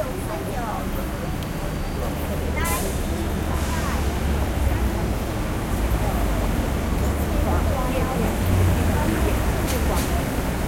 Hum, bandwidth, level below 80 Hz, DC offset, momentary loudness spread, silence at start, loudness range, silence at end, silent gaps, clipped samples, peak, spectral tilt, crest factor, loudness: none; 16.5 kHz; -26 dBFS; under 0.1%; 6 LU; 0 s; 4 LU; 0 s; none; under 0.1%; -8 dBFS; -5.5 dB/octave; 14 dB; -24 LUFS